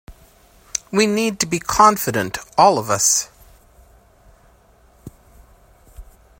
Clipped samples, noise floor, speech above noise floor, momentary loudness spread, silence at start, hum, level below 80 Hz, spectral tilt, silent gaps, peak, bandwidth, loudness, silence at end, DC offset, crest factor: under 0.1%; -52 dBFS; 36 dB; 11 LU; 0.1 s; none; -48 dBFS; -3 dB/octave; none; 0 dBFS; 16.5 kHz; -17 LUFS; 0.35 s; under 0.1%; 22 dB